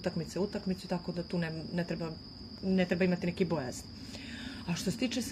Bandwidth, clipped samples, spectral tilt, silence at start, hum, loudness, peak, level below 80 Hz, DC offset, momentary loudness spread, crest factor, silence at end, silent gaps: 14.5 kHz; under 0.1%; -5.5 dB/octave; 0 s; none; -35 LUFS; -16 dBFS; -58 dBFS; under 0.1%; 13 LU; 18 dB; 0 s; none